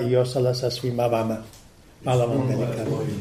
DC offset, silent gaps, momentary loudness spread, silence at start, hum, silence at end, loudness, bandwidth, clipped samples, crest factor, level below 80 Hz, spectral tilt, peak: under 0.1%; none; 6 LU; 0 s; none; 0 s; -24 LUFS; 15 kHz; under 0.1%; 14 dB; -54 dBFS; -7 dB/octave; -8 dBFS